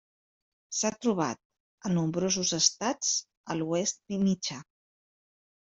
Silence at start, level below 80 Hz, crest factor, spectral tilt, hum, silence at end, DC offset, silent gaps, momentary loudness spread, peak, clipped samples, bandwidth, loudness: 0.7 s; -68 dBFS; 22 dB; -3.5 dB/octave; none; 1 s; under 0.1%; 1.45-1.50 s, 1.60-1.78 s, 3.37-3.44 s; 11 LU; -10 dBFS; under 0.1%; 8.2 kHz; -29 LUFS